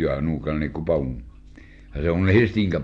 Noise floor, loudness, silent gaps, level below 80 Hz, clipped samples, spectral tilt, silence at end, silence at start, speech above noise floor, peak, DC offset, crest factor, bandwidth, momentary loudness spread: -45 dBFS; -23 LUFS; none; -38 dBFS; under 0.1%; -9 dB/octave; 0 s; 0 s; 23 dB; -4 dBFS; under 0.1%; 18 dB; 6.8 kHz; 13 LU